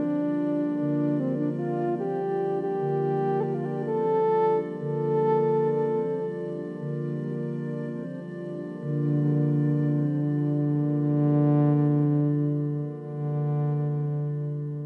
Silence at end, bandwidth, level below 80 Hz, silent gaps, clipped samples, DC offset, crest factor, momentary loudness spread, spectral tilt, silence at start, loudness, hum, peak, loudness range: 0 s; 3.7 kHz; -72 dBFS; none; under 0.1%; under 0.1%; 12 dB; 10 LU; -11.5 dB/octave; 0 s; -26 LUFS; none; -12 dBFS; 5 LU